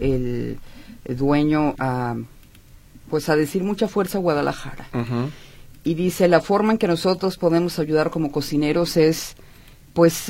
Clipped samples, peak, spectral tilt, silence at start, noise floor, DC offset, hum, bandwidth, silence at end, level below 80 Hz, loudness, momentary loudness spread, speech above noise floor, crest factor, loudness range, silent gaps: under 0.1%; -2 dBFS; -6 dB/octave; 0 s; -47 dBFS; under 0.1%; none; 16.5 kHz; 0 s; -42 dBFS; -21 LUFS; 12 LU; 27 dB; 20 dB; 4 LU; none